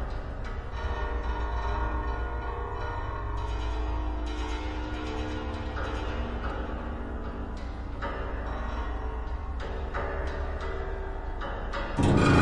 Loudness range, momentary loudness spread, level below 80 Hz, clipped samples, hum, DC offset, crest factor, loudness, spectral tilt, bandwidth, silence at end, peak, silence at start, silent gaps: 2 LU; 5 LU; -34 dBFS; under 0.1%; none; under 0.1%; 20 dB; -33 LUFS; -7 dB/octave; 10.5 kHz; 0 s; -10 dBFS; 0 s; none